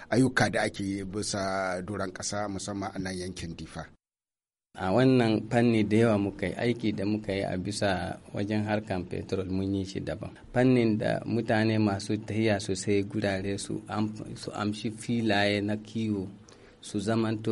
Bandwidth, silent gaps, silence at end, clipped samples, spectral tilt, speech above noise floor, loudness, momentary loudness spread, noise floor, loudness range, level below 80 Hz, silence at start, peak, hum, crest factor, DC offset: 11.5 kHz; none; 0 s; under 0.1%; -5.5 dB/octave; over 62 dB; -29 LUFS; 11 LU; under -90 dBFS; 6 LU; -56 dBFS; 0 s; -10 dBFS; none; 18 dB; under 0.1%